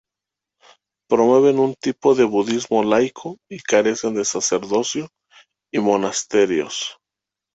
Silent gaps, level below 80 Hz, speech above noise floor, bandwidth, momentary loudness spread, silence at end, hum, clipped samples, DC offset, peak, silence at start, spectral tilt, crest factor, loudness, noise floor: none; -62 dBFS; 68 dB; 8.2 kHz; 12 LU; 0.65 s; none; under 0.1%; under 0.1%; -2 dBFS; 1.1 s; -3.5 dB/octave; 18 dB; -19 LUFS; -86 dBFS